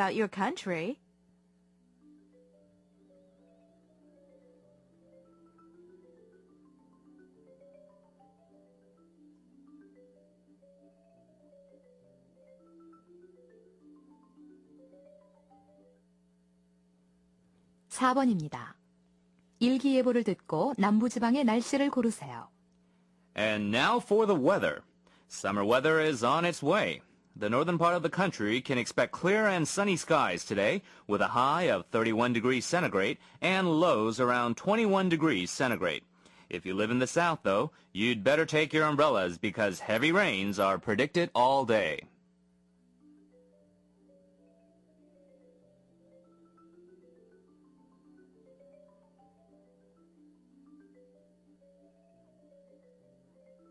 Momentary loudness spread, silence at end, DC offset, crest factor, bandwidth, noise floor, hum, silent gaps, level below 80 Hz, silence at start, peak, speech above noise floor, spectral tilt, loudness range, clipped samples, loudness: 9 LU; 11.7 s; under 0.1%; 20 dB; 12 kHz; -67 dBFS; none; none; -72 dBFS; 0 s; -14 dBFS; 39 dB; -5 dB/octave; 7 LU; under 0.1%; -29 LUFS